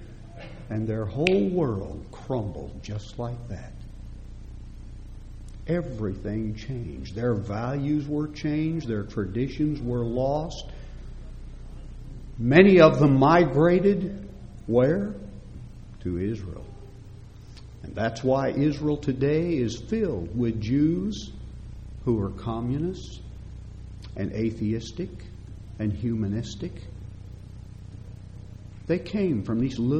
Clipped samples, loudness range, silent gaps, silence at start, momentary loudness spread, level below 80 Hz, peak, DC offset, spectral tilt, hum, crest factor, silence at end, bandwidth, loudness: under 0.1%; 14 LU; none; 0 s; 22 LU; -42 dBFS; -2 dBFS; under 0.1%; -7.5 dB/octave; none; 26 dB; 0 s; 8.8 kHz; -25 LUFS